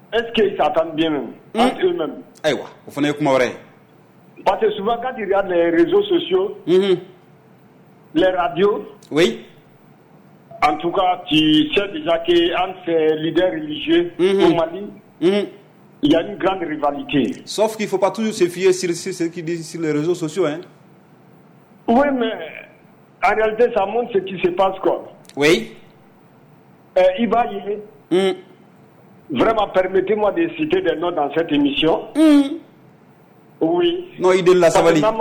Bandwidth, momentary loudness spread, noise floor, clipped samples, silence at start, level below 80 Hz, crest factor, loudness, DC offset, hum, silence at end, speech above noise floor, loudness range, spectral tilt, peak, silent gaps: 19 kHz; 10 LU; -49 dBFS; under 0.1%; 0.1 s; -50 dBFS; 14 dB; -18 LUFS; under 0.1%; none; 0 s; 31 dB; 4 LU; -5 dB/octave; -6 dBFS; none